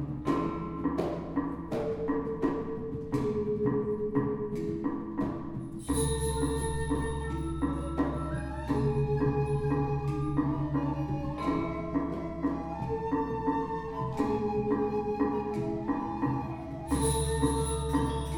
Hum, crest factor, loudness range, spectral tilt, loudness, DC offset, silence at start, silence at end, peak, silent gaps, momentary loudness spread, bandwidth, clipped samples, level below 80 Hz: none; 16 dB; 2 LU; -6.5 dB/octave; -32 LUFS; under 0.1%; 0 s; 0 s; -14 dBFS; none; 6 LU; 19 kHz; under 0.1%; -42 dBFS